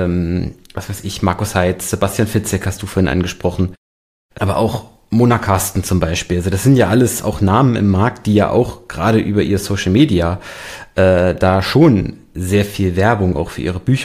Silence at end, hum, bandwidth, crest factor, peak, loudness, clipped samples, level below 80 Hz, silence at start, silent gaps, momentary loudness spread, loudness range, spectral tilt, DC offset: 0 s; none; 15.5 kHz; 14 dB; 0 dBFS; -16 LUFS; under 0.1%; -36 dBFS; 0 s; 3.77-4.29 s; 10 LU; 4 LU; -6 dB/octave; under 0.1%